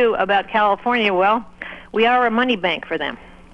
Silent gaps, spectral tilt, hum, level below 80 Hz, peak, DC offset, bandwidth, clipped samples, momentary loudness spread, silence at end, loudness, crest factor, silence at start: none; -6 dB/octave; none; -50 dBFS; -2 dBFS; under 0.1%; 8.2 kHz; under 0.1%; 10 LU; 0.3 s; -18 LUFS; 16 dB; 0 s